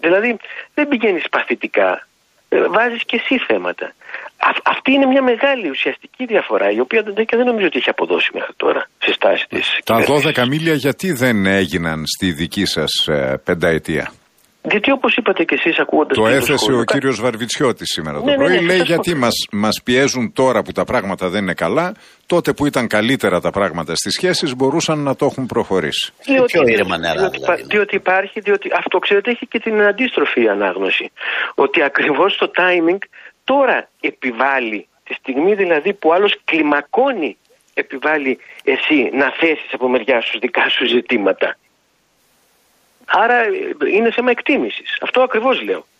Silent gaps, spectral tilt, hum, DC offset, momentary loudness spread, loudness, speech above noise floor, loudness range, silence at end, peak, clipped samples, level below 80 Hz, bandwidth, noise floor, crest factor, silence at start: none; -4.5 dB/octave; none; under 0.1%; 6 LU; -16 LUFS; 44 dB; 2 LU; 0.2 s; -2 dBFS; under 0.1%; -52 dBFS; 15 kHz; -60 dBFS; 14 dB; 0.05 s